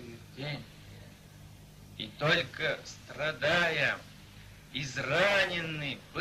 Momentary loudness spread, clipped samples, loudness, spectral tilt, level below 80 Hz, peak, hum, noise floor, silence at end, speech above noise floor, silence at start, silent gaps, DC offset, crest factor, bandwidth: 25 LU; under 0.1%; -31 LUFS; -4 dB/octave; -60 dBFS; -12 dBFS; none; -52 dBFS; 0 s; 21 dB; 0 s; none; under 0.1%; 22 dB; 15.5 kHz